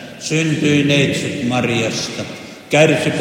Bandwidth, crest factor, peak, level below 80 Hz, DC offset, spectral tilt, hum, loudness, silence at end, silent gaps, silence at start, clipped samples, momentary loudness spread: 16.5 kHz; 16 dB; 0 dBFS; -56 dBFS; under 0.1%; -5 dB/octave; none; -16 LUFS; 0 s; none; 0 s; under 0.1%; 12 LU